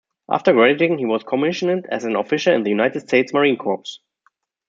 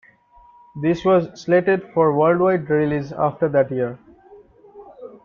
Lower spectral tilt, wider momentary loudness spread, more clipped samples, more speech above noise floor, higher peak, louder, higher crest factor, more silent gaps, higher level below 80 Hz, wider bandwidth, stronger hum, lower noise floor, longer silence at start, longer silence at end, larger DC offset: second, -5.5 dB/octave vs -8 dB/octave; about the same, 9 LU vs 10 LU; neither; first, 46 dB vs 33 dB; about the same, -2 dBFS vs -4 dBFS; about the same, -18 LUFS vs -19 LUFS; about the same, 18 dB vs 16 dB; neither; second, -68 dBFS vs -56 dBFS; first, 7.8 kHz vs 7 kHz; neither; first, -64 dBFS vs -51 dBFS; second, 0.3 s vs 0.75 s; first, 0.7 s vs 0.1 s; neither